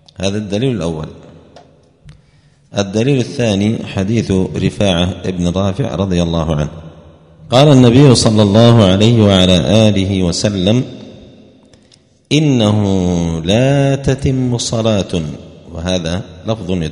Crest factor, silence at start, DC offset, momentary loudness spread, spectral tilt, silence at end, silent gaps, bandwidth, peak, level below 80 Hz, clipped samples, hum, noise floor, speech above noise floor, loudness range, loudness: 14 dB; 0.2 s; under 0.1%; 13 LU; -6 dB/octave; 0 s; none; 11 kHz; 0 dBFS; -36 dBFS; 0.3%; none; -49 dBFS; 37 dB; 8 LU; -13 LUFS